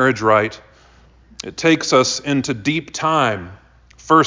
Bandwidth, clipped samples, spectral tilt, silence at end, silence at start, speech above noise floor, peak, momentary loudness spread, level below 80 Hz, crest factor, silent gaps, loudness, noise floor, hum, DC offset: 7.6 kHz; under 0.1%; -4 dB/octave; 0 s; 0 s; 31 dB; -2 dBFS; 15 LU; -50 dBFS; 18 dB; none; -17 LUFS; -49 dBFS; none; under 0.1%